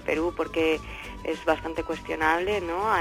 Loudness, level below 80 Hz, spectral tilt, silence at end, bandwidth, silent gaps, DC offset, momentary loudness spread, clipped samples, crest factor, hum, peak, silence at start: -27 LUFS; -46 dBFS; -5 dB/octave; 0 s; 16 kHz; none; under 0.1%; 8 LU; under 0.1%; 18 dB; none; -8 dBFS; 0 s